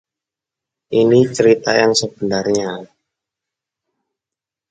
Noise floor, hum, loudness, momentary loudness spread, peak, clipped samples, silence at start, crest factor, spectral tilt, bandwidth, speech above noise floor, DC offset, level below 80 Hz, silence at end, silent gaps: -87 dBFS; none; -15 LUFS; 8 LU; 0 dBFS; under 0.1%; 0.9 s; 18 dB; -4.5 dB/octave; 9.4 kHz; 72 dB; under 0.1%; -58 dBFS; 1.85 s; none